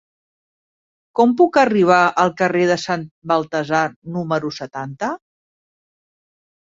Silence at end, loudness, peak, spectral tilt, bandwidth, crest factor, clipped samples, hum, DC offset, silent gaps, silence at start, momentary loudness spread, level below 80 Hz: 1.5 s; -18 LUFS; -2 dBFS; -5.5 dB/octave; 7.8 kHz; 18 dB; under 0.1%; none; under 0.1%; 3.11-3.22 s, 3.96-4.02 s; 1.15 s; 13 LU; -64 dBFS